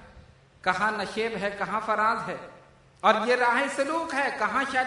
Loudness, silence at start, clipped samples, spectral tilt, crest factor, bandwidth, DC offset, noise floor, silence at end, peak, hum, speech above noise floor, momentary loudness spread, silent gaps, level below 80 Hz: -26 LUFS; 0 s; under 0.1%; -3.5 dB/octave; 20 dB; 11 kHz; under 0.1%; -53 dBFS; 0 s; -6 dBFS; none; 27 dB; 8 LU; none; -62 dBFS